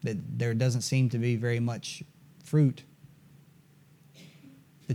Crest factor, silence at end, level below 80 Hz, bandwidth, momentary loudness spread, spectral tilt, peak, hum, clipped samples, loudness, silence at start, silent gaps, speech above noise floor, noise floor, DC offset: 16 dB; 0 s; -74 dBFS; 13.5 kHz; 18 LU; -6.5 dB/octave; -14 dBFS; none; under 0.1%; -29 LUFS; 0 s; none; 31 dB; -59 dBFS; under 0.1%